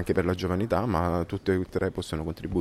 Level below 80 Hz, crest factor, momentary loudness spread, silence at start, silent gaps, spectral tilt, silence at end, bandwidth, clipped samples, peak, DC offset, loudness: -44 dBFS; 16 dB; 6 LU; 0 s; none; -7 dB/octave; 0 s; 14.5 kHz; under 0.1%; -12 dBFS; under 0.1%; -28 LUFS